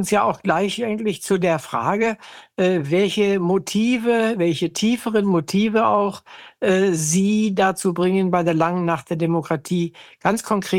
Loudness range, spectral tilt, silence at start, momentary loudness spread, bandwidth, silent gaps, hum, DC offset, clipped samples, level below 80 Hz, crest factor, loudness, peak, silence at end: 2 LU; -5 dB/octave; 0 s; 5 LU; 16.5 kHz; none; none; under 0.1%; under 0.1%; -58 dBFS; 16 dB; -20 LUFS; -4 dBFS; 0 s